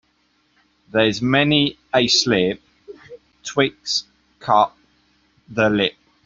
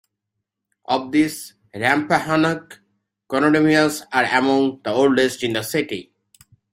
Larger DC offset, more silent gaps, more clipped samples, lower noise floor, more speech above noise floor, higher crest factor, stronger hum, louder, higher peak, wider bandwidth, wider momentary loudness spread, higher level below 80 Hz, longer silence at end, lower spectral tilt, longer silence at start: neither; neither; neither; second, -63 dBFS vs -80 dBFS; second, 45 dB vs 61 dB; about the same, 18 dB vs 18 dB; neither; about the same, -19 LUFS vs -19 LUFS; about the same, -2 dBFS vs -2 dBFS; second, 7.8 kHz vs 16 kHz; about the same, 10 LU vs 10 LU; first, -54 dBFS vs -60 dBFS; second, 0.35 s vs 0.7 s; about the same, -4 dB/octave vs -4.5 dB/octave; about the same, 0.95 s vs 0.9 s